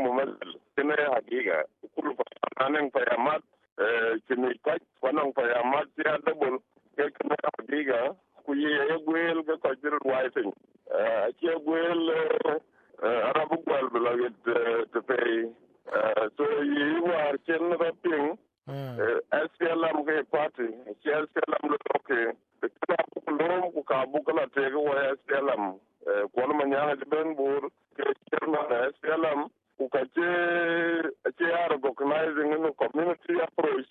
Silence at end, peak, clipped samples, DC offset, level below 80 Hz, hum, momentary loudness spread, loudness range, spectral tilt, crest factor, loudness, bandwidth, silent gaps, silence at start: 0.05 s; -10 dBFS; under 0.1%; under 0.1%; -82 dBFS; none; 7 LU; 2 LU; -8 dB/octave; 18 dB; -28 LUFS; 4.4 kHz; 3.72-3.76 s; 0 s